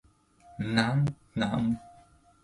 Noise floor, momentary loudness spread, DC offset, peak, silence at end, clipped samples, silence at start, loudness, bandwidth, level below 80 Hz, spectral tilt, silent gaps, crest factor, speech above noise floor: -59 dBFS; 11 LU; under 0.1%; -10 dBFS; 0.55 s; under 0.1%; 0.5 s; -29 LUFS; 11.5 kHz; -56 dBFS; -6.5 dB/octave; none; 22 dB; 31 dB